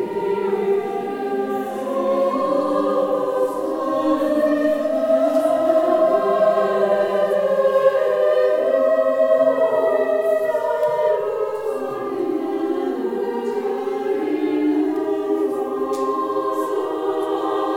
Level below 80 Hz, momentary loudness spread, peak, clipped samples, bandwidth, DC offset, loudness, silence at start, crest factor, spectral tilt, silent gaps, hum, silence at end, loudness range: -64 dBFS; 7 LU; -4 dBFS; under 0.1%; 16.5 kHz; under 0.1%; -20 LUFS; 0 s; 14 dB; -6 dB/octave; none; none; 0 s; 5 LU